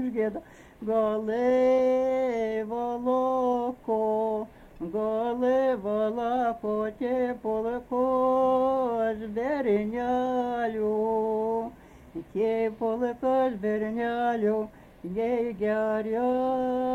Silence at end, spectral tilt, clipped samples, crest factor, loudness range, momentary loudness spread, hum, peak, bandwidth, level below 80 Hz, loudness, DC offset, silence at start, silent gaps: 0 s; -7.5 dB/octave; under 0.1%; 12 dB; 2 LU; 7 LU; none; -14 dBFS; 7.6 kHz; -58 dBFS; -27 LUFS; under 0.1%; 0 s; none